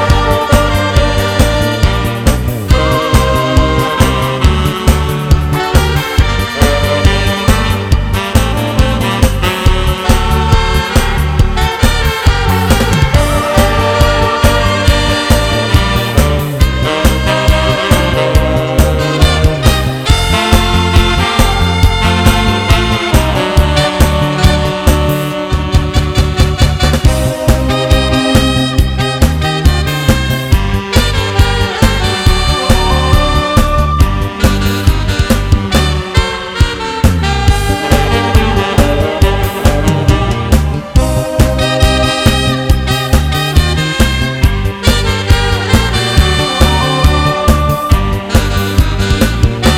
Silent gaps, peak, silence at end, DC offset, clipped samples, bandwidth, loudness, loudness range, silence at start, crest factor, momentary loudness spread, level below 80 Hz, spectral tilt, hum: none; 0 dBFS; 0 s; under 0.1%; 2%; 16.5 kHz; -11 LUFS; 2 LU; 0 s; 10 dB; 3 LU; -14 dBFS; -5 dB/octave; none